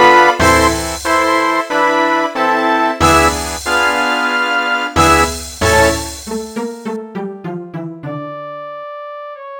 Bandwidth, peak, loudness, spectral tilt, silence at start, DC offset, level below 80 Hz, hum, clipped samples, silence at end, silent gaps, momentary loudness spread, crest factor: over 20 kHz; 0 dBFS; -13 LUFS; -3.5 dB/octave; 0 s; under 0.1%; -32 dBFS; none; under 0.1%; 0 s; none; 17 LU; 14 dB